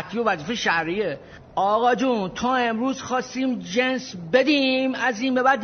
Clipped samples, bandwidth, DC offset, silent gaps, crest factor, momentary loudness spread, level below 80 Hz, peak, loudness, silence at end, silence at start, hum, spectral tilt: under 0.1%; 6.6 kHz; under 0.1%; none; 18 dB; 7 LU; -58 dBFS; -6 dBFS; -22 LUFS; 0 s; 0 s; none; -2.5 dB/octave